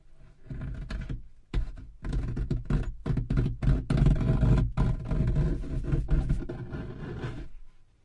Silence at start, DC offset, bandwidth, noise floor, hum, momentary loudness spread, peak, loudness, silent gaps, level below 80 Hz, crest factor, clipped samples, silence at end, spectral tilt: 0.1 s; under 0.1%; 9.4 kHz; -50 dBFS; none; 15 LU; -10 dBFS; -31 LUFS; none; -32 dBFS; 18 dB; under 0.1%; 0.25 s; -9 dB/octave